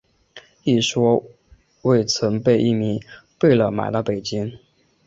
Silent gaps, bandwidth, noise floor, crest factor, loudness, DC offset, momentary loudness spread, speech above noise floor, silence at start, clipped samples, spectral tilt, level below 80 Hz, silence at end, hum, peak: none; 8 kHz; -47 dBFS; 18 dB; -20 LUFS; under 0.1%; 9 LU; 29 dB; 0.35 s; under 0.1%; -5.5 dB/octave; -54 dBFS; 0.5 s; none; -4 dBFS